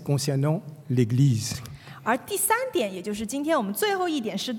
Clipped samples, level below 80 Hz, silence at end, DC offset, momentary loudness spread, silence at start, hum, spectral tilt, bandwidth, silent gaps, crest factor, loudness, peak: under 0.1%; -62 dBFS; 0 s; under 0.1%; 9 LU; 0 s; none; -5 dB/octave; 18 kHz; none; 16 dB; -25 LUFS; -8 dBFS